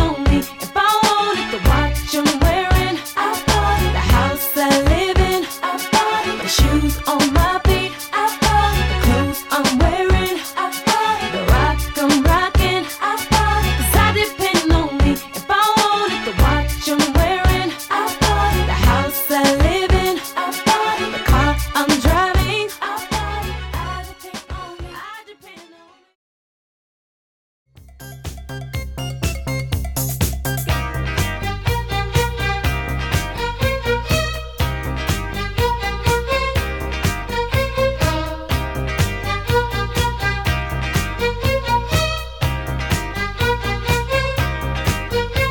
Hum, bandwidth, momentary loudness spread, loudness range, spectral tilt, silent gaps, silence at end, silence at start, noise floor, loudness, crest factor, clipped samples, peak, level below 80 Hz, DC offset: none; 18.5 kHz; 8 LU; 8 LU; -4.5 dB/octave; 26.15-27.66 s; 0 s; 0 s; -49 dBFS; -18 LUFS; 14 dB; under 0.1%; -4 dBFS; -24 dBFS; under 0.1%